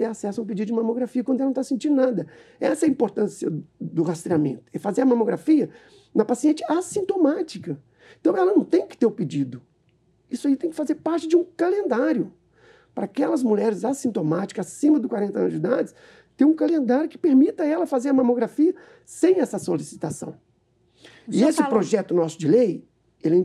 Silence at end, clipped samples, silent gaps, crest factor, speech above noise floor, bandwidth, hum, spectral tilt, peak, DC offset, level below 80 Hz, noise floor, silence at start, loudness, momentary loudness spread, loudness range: 0 s; under 0.1%; none; 18 dB; 42 dB; 12.5 kHz; none; -6.5 dB/octave; -6 dBFS; under 0.1%; -72 dBFS; -64 dBFS; 0 s; -23 LUFS; 11 LU; 3 LU